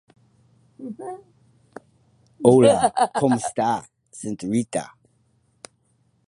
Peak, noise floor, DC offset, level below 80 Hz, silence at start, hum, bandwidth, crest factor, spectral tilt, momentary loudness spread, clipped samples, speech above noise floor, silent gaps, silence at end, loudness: -2 dBFS; -65 dBFS; under 0.1%; -62 dBFS; 0.8 s; none; 11.5 kHz; 22 dB; -5.5 dB/octave; 24 LU; under 0.1%; 45 dB; none; 1.45 s; -20 LUFS